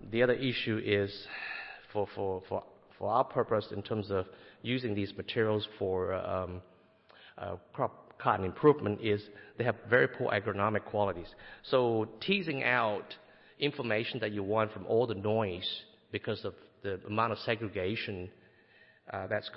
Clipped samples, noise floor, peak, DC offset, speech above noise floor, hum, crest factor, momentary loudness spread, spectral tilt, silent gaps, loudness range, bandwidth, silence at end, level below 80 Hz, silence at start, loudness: under 0.1%; -62 dBFS; -12 dBFS; under 0.1%; 30 dB; none; 22 dB; 14 LU; -9.5 dB/octave; none; 5 LU; 5.8 kHz; 0 s; -66 dBFS; 0 s; -33 LUFS